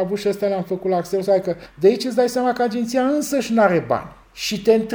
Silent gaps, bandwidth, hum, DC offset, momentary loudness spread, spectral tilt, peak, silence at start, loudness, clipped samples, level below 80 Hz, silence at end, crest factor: none; over 20 kHz; none; under 0.1%; 8 LU; -5 dB/octave; -2 dBFS; 0 s; -20 LUFS; under 0.1%; -54 dBFS; 0 s; 18 dB